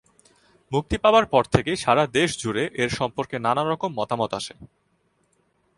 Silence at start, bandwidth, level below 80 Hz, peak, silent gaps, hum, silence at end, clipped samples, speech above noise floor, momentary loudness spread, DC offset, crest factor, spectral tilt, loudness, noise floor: 0.7 s; 11.5 kHz; -46 dBFS; -2 dBFS; none; none; 1.15 s; under 0.1%; 45 dB; 9 LU; under 0.1%; 22 dB; -5 dB/octave; -23 LUFS; -68 dBFS